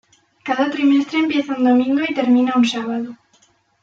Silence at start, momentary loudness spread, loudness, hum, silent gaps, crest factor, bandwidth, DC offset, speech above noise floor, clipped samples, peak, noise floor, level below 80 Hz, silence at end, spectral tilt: 0.45 s; 10 LU; -17 LUFS; none; none; 12 dB; 7.8 kHz; under 0.1%; 41 dB; under 0.1%; -6 dBFS; -58 dBFS; -68 dBFS; 0.7 s; -4.5 dB/octave